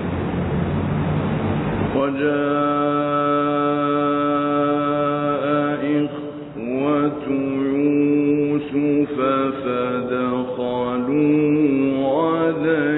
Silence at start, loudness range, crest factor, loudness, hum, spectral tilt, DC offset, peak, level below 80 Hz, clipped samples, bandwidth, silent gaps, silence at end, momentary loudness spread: 0 s; 2 LU; 12 dB; -20 LUFS; none; -12 dB/octave; under 0.1%; -6 dBFS; -46 dBFS; under 0.1%; 4.1 kHz; none; 0 s; 5 LU